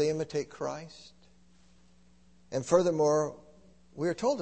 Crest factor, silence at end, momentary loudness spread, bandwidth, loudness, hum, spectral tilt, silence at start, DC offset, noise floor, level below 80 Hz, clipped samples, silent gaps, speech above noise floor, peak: 22 dB; 0 s; 20 LU; 8.8 kHz; -30 LUFS; none; -5.5 dB/octave; 0 s; under 0.1%; -63 dBFS; -66 dBFS; under 0.1%; none; 34 dB; -10 dBFS